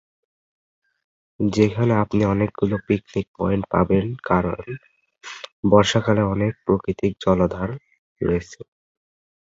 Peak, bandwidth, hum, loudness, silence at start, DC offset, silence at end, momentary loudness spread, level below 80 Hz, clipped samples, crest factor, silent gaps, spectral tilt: -2 dBFS; 7.8 kHz; none; -21 LUFS; 1.4 s; under 0.1%; 0.85 s; 17 LU; -44 dBFS; under 0.1%; 20 dB; 3.28-3.34 s, 5.52-5.63 s, 7.99-8.16 s; -7 dB/octave